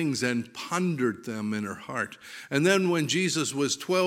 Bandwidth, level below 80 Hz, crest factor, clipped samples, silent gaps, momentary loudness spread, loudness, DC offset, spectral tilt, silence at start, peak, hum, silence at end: 16.5 kHz; -74 dBFS; 20 dB; under 0.1%; none; 10 LU; -27 LUFS; under 0.1%; -4 dB/octave; 0 s; -8 dBFS; none; 0 s